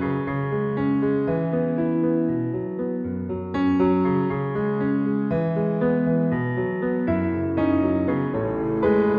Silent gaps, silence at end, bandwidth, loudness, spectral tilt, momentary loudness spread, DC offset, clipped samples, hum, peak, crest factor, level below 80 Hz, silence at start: none; 0 s; 4.9 kHz; -23 LUFS; -11 dB/octave; 6 LU; under 0.1%; under 0.1%; none; -8 dBFS; 14 dB; -50 dBFS; 0 s